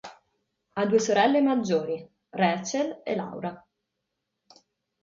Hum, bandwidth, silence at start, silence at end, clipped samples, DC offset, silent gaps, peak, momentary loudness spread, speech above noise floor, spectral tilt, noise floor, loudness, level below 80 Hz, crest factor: none; 7.6 kHz; 0.05 s; 1.45 s; under 0.1%; under 0.1%; none; -10 dBFS; 16 LU; 57 dB; -5 dB/octave; -82 dBFS; -26 LUFS; -72 dBFS; 18 dB